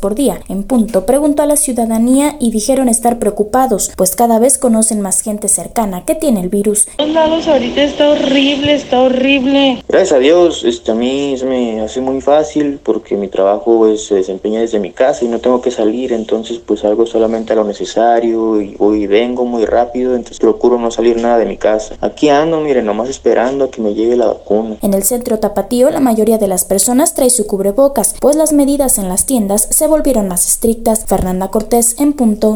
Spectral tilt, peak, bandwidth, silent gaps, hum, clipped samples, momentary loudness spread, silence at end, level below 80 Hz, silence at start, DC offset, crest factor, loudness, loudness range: -3.5 dB/octave; 0 dBFS; over 20 kHz; none; none; under 0.1%; 6 LU; 0 s; -34 dBFS; 0 s; under 0.1%; 12 dB; -12 LUFS; 3 LU